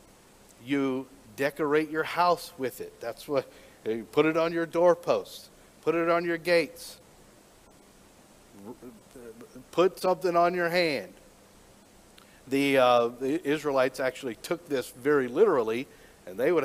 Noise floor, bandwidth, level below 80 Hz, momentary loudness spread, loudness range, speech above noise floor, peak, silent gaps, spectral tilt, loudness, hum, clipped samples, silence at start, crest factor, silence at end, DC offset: -56 dBFS; 16 kHz; -66 dBFS; 22 LU; 5 LU; 29 dB; -8 dBFS; none; -5 dB/octave; -27 LUFS; none; under 0.1%; 0.65 s; 20 dB; 0 s; under 0.1%